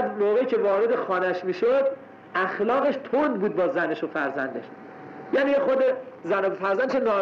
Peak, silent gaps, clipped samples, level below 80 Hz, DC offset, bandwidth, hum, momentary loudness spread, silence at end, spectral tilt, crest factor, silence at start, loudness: -16 dBFS; none; under 0.1%; -70 dBFS; under 0.1%; 6.8 kHz; none; 10 LU; 0 s; -7 dB/octave; 8 dB; 0 s; -24 LUFS